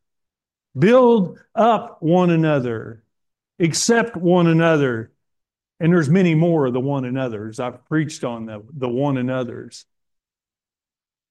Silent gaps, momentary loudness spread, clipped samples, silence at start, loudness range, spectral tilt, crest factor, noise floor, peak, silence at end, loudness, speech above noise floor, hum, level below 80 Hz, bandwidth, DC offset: none; 14 LU; under 0.1%; 0.75 s; 8 LU; -6 dB/octave; 16 dB; under -90 dBFS; -4 dBFS; 1.5 s; -18 LUFS; over 72 dB; none; -64 dBFS; 12 kHz; under 0.1%